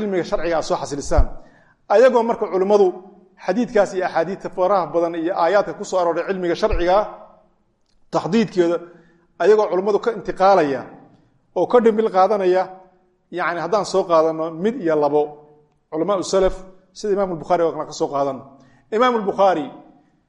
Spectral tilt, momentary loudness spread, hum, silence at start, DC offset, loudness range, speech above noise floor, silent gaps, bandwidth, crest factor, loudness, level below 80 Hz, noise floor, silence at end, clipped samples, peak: -5.5 dB/octave; 10 LU; none; 0 s; under 0.1%; 3 LU; 43 dB; none; 11 kHz; 18 dB; -19 LUFS; -34 dBFS; -61 dBFS; 0.45 s; under 0.1%; -2 dBFS